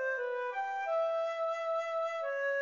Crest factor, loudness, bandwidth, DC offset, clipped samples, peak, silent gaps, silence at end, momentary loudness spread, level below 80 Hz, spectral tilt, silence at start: 10 dB; -34 LUFS; 7.6 kHz; under 0.1%; under 0.1%; -24 dBFS; none; 0 s; 3 LU; under -90 dBFS; 1 dB/octave; 0 s